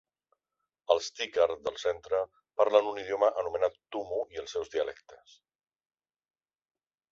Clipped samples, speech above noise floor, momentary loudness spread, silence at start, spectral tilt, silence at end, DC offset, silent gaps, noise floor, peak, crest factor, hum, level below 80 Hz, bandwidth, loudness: under 0.1%; 57 dB; 11 LU; 0.9 s; -2.5 dB/octave; 1.95 s; under 0.1%; none; -87 dBFS; -10 dBFS; 24 dB; none; -68 dBFS; 7.6 kHz; -30 LUFS